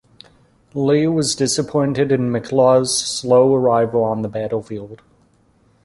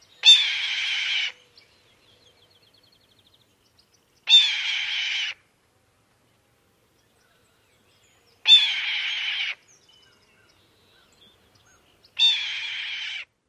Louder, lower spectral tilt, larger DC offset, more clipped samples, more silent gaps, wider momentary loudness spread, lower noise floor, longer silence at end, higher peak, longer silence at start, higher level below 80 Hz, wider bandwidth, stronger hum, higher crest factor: about the same, -17 LUFS vs -19 LUFS; first, -5 dB/octave vs 4 dB/octave; neither; neither; neither; second, 11 LU vs 17 LU; second, -56 dBFS vs -65 dBFS; first, 0.9 s vs 0.25 s; about the same, -2 dBFS vs -4 dBFS; first, 0.75 s vs 0.25 s; first, -54 dBFS vs -76 dBFS; second, 11.5 kHz vs 13 kHz; neither; second, 16 dB vs 22 dB